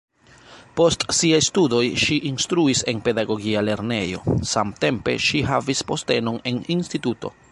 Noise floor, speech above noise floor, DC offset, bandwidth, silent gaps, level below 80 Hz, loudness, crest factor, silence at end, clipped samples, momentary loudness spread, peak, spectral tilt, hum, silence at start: -48 dBFS; 27 dB; under 0.1%; 11.5 kHz; none; -46 dBFS; -21 LUFS; 18 dB; 0.2 s; under 0.1%; 7 LU; -4 dBFS; -4 dB/octave; none; 0.5 s